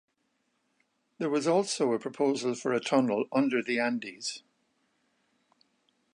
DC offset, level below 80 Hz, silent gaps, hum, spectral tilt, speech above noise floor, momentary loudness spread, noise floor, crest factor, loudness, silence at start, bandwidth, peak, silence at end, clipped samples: under 0.1%; -84 dBFS; none; none; -4.5 dB/octave; 48 dB; 9 LU; -76 dBFS; 20 dB; -29 LUFS; 1.2 s; 11 kHz; -12 dBFS; 1.75 s; under 0.1%